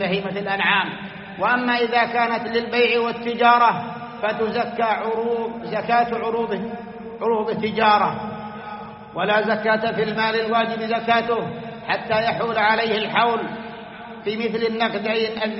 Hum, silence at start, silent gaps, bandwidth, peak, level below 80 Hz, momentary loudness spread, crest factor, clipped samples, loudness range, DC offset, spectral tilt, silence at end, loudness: none; 0 s; none; 6 kHz; -4 dBFS; -60 dBFS; 14 LU; 18 dB; under 0.1%; 4 LU; under 0.1%; -2 dB/octave; 0 s; -21 LUFS